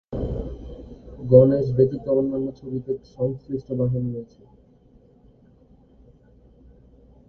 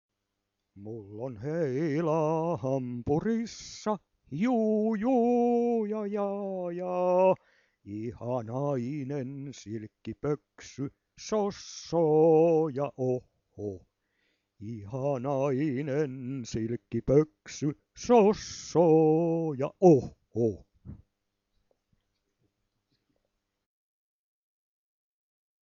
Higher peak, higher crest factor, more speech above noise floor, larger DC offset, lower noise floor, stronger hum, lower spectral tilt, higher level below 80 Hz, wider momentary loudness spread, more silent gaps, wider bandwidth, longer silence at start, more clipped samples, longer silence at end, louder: first, 0 dBFS vs -8 dBFS; about the same, 24 dB vs 22 dB; second, 33 dB vs 55 dB; neither; second, -54 dBFS vs -83 dBFS; neither; first, -12 dB/octave vs -7.5 dB/octave; first, -44 dBFS vs -60 dBFS; first, 21 LU vs 18 LU; neither; second, 4.5 kHz vs 7.4 kHz; second, 0.1 s vs 0.75 s; neither; second, 3.05 s vs 4.65 s; first, -22 LUFS vs -28 LUFS